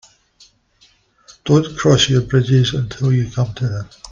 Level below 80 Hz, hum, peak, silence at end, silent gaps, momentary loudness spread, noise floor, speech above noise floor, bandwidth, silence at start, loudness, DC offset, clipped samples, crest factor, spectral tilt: -42 dBFS; none; -2 dBFS; 0 s; none; 10 LU; -55 dBFS; 39 dB; 7.4 kHz; 1.45 s; -16 LUFS; under 0.1%; under 0.1%; 16 dB; -5.5 dB/octave